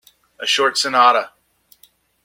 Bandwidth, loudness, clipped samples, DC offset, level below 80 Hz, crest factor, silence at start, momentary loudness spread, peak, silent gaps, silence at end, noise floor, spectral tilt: 16.5 kHz; -16 LUFS; under 0.1%; under 0.1%; -72 dBFS; 18 dB; 0.4 s; 12 LU; -2 dBFS; none; 0.95 s; -55 dBFS; -0.5 dB/octave